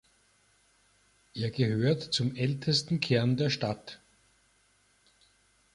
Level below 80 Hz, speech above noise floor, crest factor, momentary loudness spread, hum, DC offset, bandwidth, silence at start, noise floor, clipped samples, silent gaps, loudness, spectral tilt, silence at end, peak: -64 dBFS; 39 dB; 20 dB; 14 LU; none; under 0.1%; 11.5 kHz; 1.35 s; -68 dBFS; under 0.1%; none; -29 LUFS; -5.5 dB/octave; 1.8 s; -12 dBFS